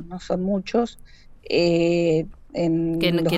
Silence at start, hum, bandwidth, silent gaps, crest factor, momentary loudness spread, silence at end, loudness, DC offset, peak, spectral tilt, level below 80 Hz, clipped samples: 0 s; none; 15 kHz; none; 16 dB; 8 LU; 0 s; -23 LUFS; under 0.1%; -8 dBFS; -6.5 dB/octave; -46 dBFS; under 0.1%